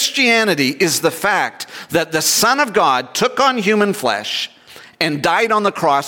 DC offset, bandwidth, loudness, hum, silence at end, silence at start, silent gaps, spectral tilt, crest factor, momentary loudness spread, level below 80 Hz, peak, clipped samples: under 0.1%; 17 kHz; -15 LUFS; none; 0 s; 0 s; none; -2.5 dB/octave; 14 dB; 8 LU; -60 dBFS; -2 dBFS; under 0.1%